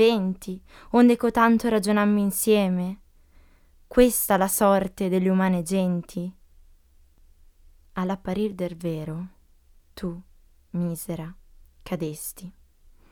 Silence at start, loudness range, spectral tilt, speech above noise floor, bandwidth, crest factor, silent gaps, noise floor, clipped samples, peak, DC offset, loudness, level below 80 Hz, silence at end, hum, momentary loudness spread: 0 s; 12 LU; -5.5 dB/octave; 33 dB; 19 kHz; 22 dB; none; -56 dBFS; under 0.1%; -4 dBFS; under 0.1%; -24 LUFS; -48 dBFS; 0.6 s; none; 18 LU